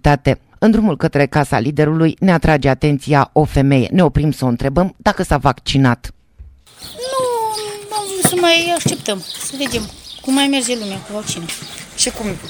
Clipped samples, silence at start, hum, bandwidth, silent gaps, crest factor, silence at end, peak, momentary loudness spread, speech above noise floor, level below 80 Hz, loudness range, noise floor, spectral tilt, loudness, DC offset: under 0.1%; 0.05 s; none; over 20 kHz; none; 16 dB; 0 s; 0 dBFS; 11 LU; 26 dB; -32 dBFS; 5 LU; -41 dBFS; -5 dB/octave; -16 LUFS; under 0.1%